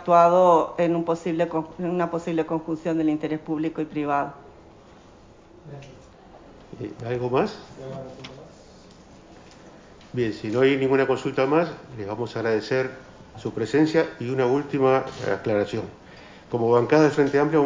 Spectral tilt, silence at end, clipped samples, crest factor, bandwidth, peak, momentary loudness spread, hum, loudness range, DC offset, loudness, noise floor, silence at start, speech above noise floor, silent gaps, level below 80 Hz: -7 dB/octave; 0 s; under 0.1%; 20 dB; 7.6 kHz; -4 dBFS; 18 LU; none; 9 LU; under 0.1%; -23 LUFS; -50 dBFS; 0 s; 27 dB; none; -58 dBFS